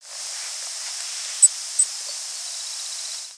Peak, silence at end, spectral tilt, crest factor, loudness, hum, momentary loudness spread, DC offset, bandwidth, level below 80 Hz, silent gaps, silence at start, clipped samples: -2 dBFS; 0 s; 6.5 dB/octave; 24 dB; -22 LUFS; none; 13 LU; under 0.1%; 11 kHz; -86 dBFS; none; 0 s; under 0.1%